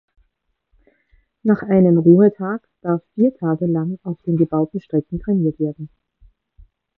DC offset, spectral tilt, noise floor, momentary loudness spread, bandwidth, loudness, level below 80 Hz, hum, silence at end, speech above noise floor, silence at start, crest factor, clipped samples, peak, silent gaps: under 0.1%; -13.5 dB/octave; -71 dBFS; 14 LU; 3 kHz; -18 LUFS; -50 dBFS; none; 1.1 s; 54 dB; 1.45 s; 18 dB; under 0.1%; 0 dBFS; none